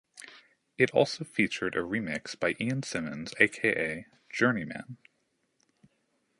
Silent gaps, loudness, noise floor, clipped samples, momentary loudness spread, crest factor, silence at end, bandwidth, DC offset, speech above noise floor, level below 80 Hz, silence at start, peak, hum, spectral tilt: none; -29 LUFS; -76 dBFS; under 0.1%; 17 LU; 26 dB; 1.45 s; 11.5 kHz; under 0.1%; 46 dB; -66 dBFS; 0.15 s; -4 dBFS; none; -5 dB/octave